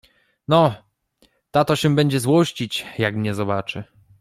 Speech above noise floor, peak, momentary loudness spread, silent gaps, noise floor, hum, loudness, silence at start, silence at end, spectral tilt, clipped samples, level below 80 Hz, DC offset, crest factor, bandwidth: 42 dB; -2 dBFS; 13 LU; none; -62 dBFS; none; -20 LUFS; 0.5 s; 0.35 s; -6 dB/octave; under 0.1%; -56 dBFS; under 0.1%; 18 dB; 15 kHz